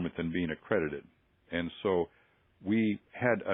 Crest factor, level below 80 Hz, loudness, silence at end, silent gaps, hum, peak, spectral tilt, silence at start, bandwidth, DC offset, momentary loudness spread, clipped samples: 22 dB; -66 dBFS; -33 LUFS; 0 s; none; none; -12 dBFS; -5.5 dB/octave; 0 s; 3.9 kHz; under 0.1%; 9 LU; under 0.1%